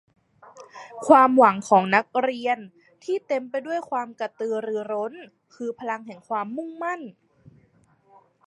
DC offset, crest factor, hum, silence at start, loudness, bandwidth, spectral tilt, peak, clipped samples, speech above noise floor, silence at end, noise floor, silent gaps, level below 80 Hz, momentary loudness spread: under 0.1%; 24 dB; none; 0.55 s; -23 LUFS; 11.5 kHz; -5.5 dB/octave; -2 dBFS; under 0.1%; 38 dB; 1.35 s; -61 dBFS; none; -74 dBFS; 18 LU